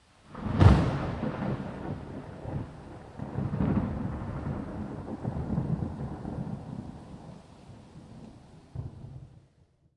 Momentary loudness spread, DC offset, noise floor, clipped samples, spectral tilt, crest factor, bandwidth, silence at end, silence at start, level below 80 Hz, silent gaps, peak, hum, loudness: 22 LU; under 0.1%; -64 dBFS; under 0.1%; -8.5 dB/octave; 28 dB; 10.5 kHz; 0.55 s; 0.3 s; -42 dBFS; none; -4 dBFS; none; -31 LUFS